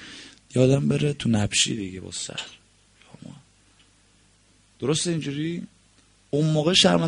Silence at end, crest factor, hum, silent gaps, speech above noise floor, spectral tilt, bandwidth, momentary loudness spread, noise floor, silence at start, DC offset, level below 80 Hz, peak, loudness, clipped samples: 0 s; 22 dB; 50 Hz at -60 dBFS; none; 37 dB; -4.5 dB/octave; 10.5 kHz; 22 LU; -59 dBFS; 0 s; under 0.1%; -54 dBFS; -4 dBFS; -23 LUFS; under 0.1%